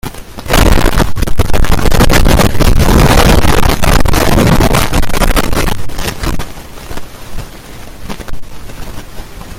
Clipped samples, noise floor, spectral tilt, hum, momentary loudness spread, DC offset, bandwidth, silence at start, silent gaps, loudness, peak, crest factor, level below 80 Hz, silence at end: 0.6%; -27 dBFS; -5 dB/octave; none; 21 LU; under 0.1%; 17 kHz; 0.05 s; none; -11 LUFS; 0 dBFS; 8 dB; -14 dBFS; 0 s